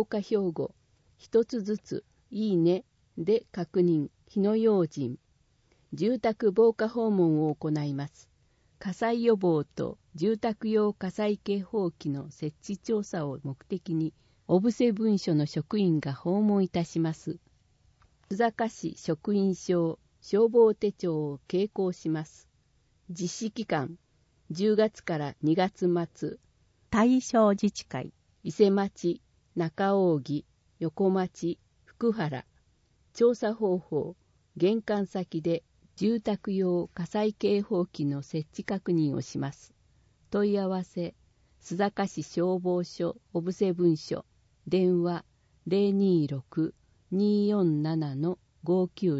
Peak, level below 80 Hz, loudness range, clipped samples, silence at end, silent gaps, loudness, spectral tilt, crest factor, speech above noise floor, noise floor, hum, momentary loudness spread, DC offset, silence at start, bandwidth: -10 dBFS; -66 dBFS; 4 LU; under 0.1%; 0 s; none; -29 LUFS; -7 dB/octave; 18 dB; 40 dB; -68 dBFS; none; 13 LU; under 0.1%; 0 s; 8 kHz